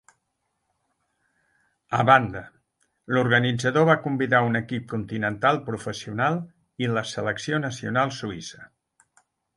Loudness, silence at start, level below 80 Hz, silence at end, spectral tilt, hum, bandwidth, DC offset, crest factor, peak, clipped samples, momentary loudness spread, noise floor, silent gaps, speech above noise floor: -24 LUFS; 1.9 s; -60 dBFS; 0.9 s; -5.5 dB/octave; none; 11.5 kHz; under 0.1%; 24 dB; -2 dBFS; under 0.1%; 13 LU; -77 dBFS; none; 53 dB